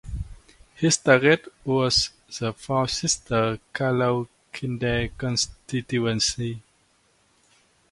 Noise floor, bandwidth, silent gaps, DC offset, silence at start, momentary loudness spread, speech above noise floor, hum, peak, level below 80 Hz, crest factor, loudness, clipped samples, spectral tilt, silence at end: -64 dBFS; 11.5 kHz; none; under 0.1%; 0.05 s; 14 LU; 40 dB; none; -2 dBFS; -46 dBFS; 24 dB; -24 LUFS; under 0.1%; -4 dB/octave; 1.3 s